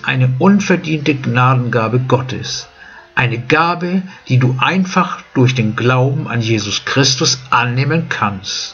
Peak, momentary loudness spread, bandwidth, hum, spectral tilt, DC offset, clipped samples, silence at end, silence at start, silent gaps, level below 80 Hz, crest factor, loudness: 0 dBFS; 7 LU; 7.2 kHz; none; -5 dB/octave; under 0.1%; under 0.1%; 0 s; 0.05 s; none; -50 dBFS; 14 dB; -14 LUFS